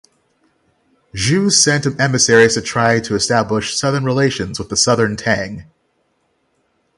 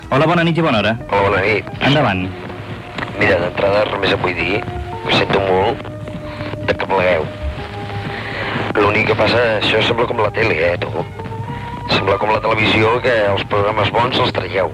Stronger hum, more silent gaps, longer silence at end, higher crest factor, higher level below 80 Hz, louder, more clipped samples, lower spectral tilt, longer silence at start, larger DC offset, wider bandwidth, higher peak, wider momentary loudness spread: neither; neither; first, 1.35 s vs 0 s; first, 18 dB vs 12 dB; second, -46 dBFS vs -38 dBFS; about the same, -15 LUFS vs -16 LUFS; neither; second, -3.5 dB/octave vs -6 dB/octave; first, 1.15 s vs 0 s; neither; about the same, 11.5 kHz vs 12.5 kHz; first, 0 dBFS vs -4 dBFS; second, 9 LU vs 12 LU